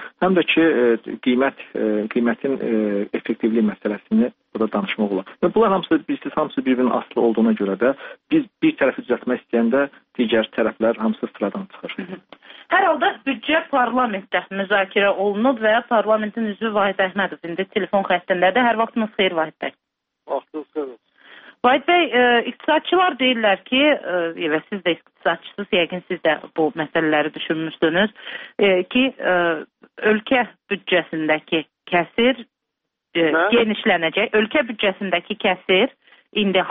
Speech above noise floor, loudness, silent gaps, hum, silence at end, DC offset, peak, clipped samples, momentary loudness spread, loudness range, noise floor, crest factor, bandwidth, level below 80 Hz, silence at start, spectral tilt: 60 dB; -20 LUFS; none; none; 0 s; under 0.1%; -2 dBFS; under 0.1%; 9 LU; 3 LU; -80 dBFS; 18 dB; 4.6 kHz; -60 dBFS; 0 s; -2.5 dB/octave